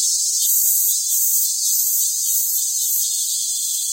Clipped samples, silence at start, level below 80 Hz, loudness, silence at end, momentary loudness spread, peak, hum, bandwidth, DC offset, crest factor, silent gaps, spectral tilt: under 0.1%; 0 s; -84 dBFS; -16 LUFS; 0 s; 5 LU; -4 dBFS; none; 16.5 kHz; under 0.1%; 16 dB; none; 6.5 dB/octave